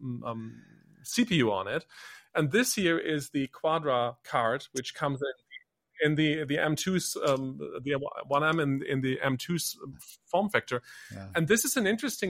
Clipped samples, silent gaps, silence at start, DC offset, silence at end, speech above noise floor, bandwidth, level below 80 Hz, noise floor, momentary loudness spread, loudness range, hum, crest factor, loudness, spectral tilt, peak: under 0.1%; none; 0 s; under 0.1%; 0 s; 24 dB; 16.5 kHz; -66 dBFS; -53 dBFS; 16 LU; 2 LU; none; 22 dB; -29 LUFS; -4.5 dB/octave; -8 dBFS